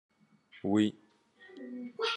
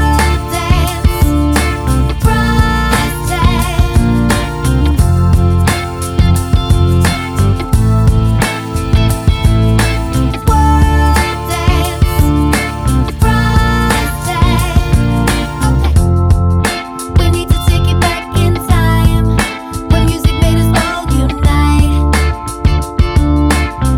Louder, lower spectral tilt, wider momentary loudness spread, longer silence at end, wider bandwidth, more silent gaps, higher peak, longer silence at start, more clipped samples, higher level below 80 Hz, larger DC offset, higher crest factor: second, -33 LUFS vs -12 LUFS; about the same, -5.5 dB/octave vs -6 dB/octave; first, 19 LU vs 4 LU; about the same, 0 s vs 0 s; second, 10.5 kHz vs 17.5 kHz; neither; second, -16 dBFS vs 0 dBFS; first, 0.55 s vs 0 s; neither; second, -84 dBFS vs -14 dBFS; neither; first, 20 dB vs 10 dB